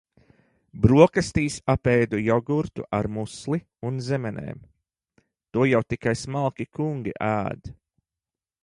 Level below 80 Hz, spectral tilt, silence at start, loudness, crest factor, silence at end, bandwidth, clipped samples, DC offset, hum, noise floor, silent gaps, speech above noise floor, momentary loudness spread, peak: -46 dBFS; -7 dB/octave; 0.75 s; -24 LUFS; 22 dB; 0.9 s; 11.5 kHz; under 0.1%; under 0.1%; none; under -90 dBFS; none; over 67 dB; 13 LU; -2 dBFS